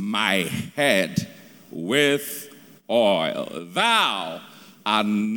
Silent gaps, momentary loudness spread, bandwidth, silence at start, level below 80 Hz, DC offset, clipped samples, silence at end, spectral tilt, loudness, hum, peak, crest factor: none; 15 LU; over 20 kHz; 0 s; -66 dBFS; under 0.1%; under 0.1%; 0 s; -4 dB/octave; -22 LUFS; none; -4 dBFS; 20 dB